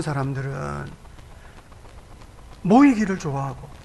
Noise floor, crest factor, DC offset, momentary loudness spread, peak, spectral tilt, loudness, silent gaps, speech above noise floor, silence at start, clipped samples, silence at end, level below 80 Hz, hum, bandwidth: -44 dBFS; 20 dB; under 0.1%; 17 LU; -4 dBFS; -7 dB/octave; -21 LUFS; none; 23 dB; 0 s; under 0.1%; 0 s; -44 dBFS; none; 11.5 kHz